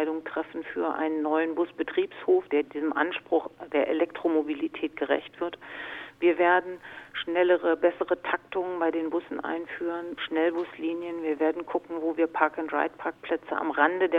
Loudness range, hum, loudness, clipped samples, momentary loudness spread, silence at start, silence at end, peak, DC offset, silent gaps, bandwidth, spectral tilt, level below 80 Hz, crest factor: 3 LU; none; -28 LUFS; under 0.1%; 10 LU; 0 s; 0 s; -6 dBFS; under 0.1%; none; 4.2 kHz; -6 dB/octave; -70 dBFS; 22 dB